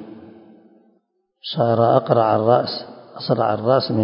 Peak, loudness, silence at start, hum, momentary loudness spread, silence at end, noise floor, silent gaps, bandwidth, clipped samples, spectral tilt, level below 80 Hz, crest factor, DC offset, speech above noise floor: 0 dBFS; -18 LUFS; 0 s; none; 17 LU; 0 s; -66 dBFS; none; 5.4 kHz; under 0.1%; -10 dB/octave; -62 dBFS; 20 dB; under 0.1%; 48 dB